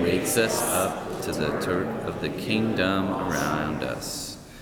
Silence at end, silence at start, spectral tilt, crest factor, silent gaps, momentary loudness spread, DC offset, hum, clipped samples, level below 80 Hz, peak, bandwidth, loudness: 0 s; 0 s; -4 dB/octave; 18 dB; none; 8 LU; under 0.1%; none; under 0.1%; -50 dBFS; -8 dBFS; over 20 kHz; -26 LUFS